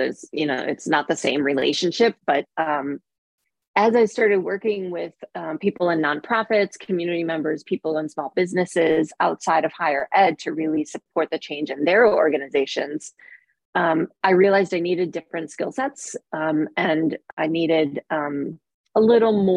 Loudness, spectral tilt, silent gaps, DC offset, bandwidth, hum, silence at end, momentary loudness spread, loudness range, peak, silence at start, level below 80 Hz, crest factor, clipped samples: -22 LUFS; -5 dB/octave; 3.18-3.38 s, 3.67-3.74 s, 13.65-13.73 s, 17.33-17.37 s, 18.74-18.84 s; under 0.1%; 11 kHz; none; 0 s; 11 LU; 3 LU; -4 dBFS; 0 s; -68 dBFS; 18 dB; under 0.1%